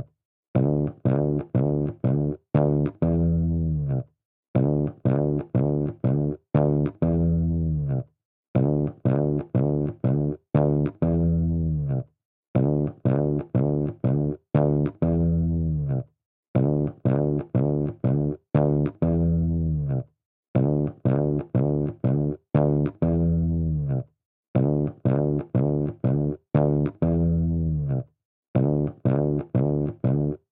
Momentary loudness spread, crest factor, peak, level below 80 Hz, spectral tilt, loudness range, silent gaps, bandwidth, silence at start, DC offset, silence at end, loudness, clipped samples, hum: 6 LU; 16 dB; -8 dBFS; -40 dBFS; -14.5 dB/octave; 1 LU; 0.25-0.54 s, 4.25-4.54 s, 8.25-8.54 s, 12.25-12.54 s, 16.26-16.54 s, 20.26-20.54 s, 24.25-24.54 s, 28.25-28.54 s; 3.7 kHz; 0 s; under 0.1%; 0.15 s; -24 LUFS; under 0.1%; none